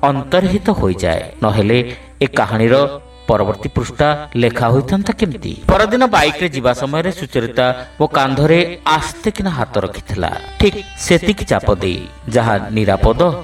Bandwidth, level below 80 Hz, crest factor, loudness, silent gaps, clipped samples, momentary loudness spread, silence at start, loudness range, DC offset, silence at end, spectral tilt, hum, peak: 16 kHz; -30 dBFS; 14 dB; -15 LUFS; none; under 0.1%; 8 LU; 0 s; 2 LU; under 0.1%; 0 s; -6 dB/octave; none; 0 dBFS